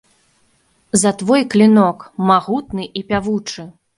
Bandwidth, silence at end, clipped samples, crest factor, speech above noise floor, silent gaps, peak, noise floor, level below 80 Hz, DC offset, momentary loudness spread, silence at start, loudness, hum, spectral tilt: 11.5 kHz; 0.25 s; under 0.1%; 16 dB; 44 dB; none; 0 dBFS; -59 dBFS; -50 dBFS; under 0.1%; 14 LU; 0.95 s; -16 LUFS; none; -5 dB/octave